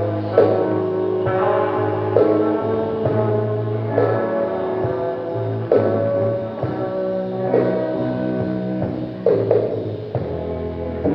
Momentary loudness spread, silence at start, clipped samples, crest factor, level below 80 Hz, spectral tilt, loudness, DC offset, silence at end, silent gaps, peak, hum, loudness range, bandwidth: 8 LU; 0 s; under 0.1%; 18 dB; -48 dBFS; -10.5 dB/octave; -20 LUFS; under 0.1%; 0 s; none; 0 dBFS; none; 3 LU; 5.6 kHz